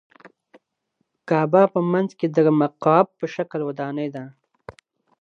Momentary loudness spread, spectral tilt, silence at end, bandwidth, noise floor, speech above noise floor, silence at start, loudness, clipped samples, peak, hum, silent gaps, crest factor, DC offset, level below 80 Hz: 11 LU; -8.5 dB/octave; 0.5 s; 7.2 kHz; -74 dBFS; 54 dB; 0.25 s; -21 LUFS; under 0.1%; -2 dBFS; none; none; 20 dB; under 0.1%; -68 dBFS